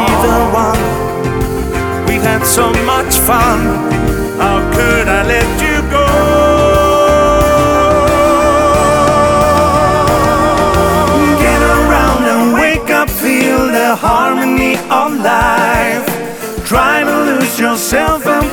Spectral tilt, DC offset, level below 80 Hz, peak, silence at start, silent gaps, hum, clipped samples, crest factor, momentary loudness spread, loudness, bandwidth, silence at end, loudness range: -4.5 dB/octave; under 0.1%; -22 dBFS; 0 dBFS; 0 s; none; none; under 0.1%; 10 dB; 5 LU; -10 LUFS; over 20 kHz; 0 s; 3 LU